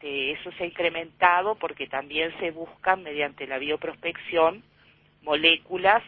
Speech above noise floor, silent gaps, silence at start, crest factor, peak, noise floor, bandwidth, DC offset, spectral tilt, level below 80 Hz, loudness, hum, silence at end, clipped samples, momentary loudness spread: 33 dB; none; 0.05 s; 22 dB; -4 dBFS; -59 dBFS; 5.4 kHz; under 0.1%; -6.5 dB/octave; -62 dBFS; -25 LUFS; none; 0 s; under 0.1%; 12 LU